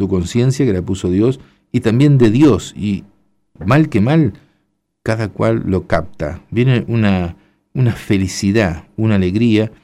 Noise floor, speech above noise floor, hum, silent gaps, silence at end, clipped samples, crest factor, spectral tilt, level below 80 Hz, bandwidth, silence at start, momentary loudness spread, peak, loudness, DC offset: -66 dBFS; 52 dB; none; none; 0.15 s; under 0.1%; 12 dB; -7 dB/octave; -40 dBFS; 13 kHz; 0 s; 10 LU; -2 dBFS; -15 LUFS; under 0.1%